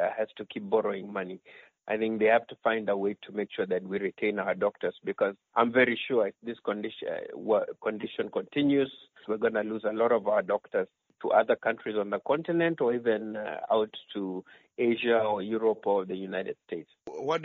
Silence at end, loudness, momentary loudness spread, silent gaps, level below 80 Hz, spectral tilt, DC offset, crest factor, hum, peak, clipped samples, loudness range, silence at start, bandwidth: 0 s; -29 LUFS; 11 LU; none; -74 dBFS; -3.5 dB/octave; under 0.1%; 20 dB; none; -10 dBFS; under 0.1%; 2 LU; 0 s; 6.4 kHz